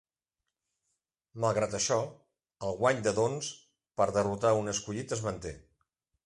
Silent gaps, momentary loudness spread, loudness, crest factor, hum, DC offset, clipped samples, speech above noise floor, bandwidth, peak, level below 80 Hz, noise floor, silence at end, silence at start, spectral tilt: none; 14 LU; -31 LUFS; 20 dB; none; under 0.1%; under 0.1%; 58 dB; 11.5 kHz; -12 dBFS; -60 dBFS; -89 dBFS; 0.65 s; 1.35 s; -4.5 dB/octave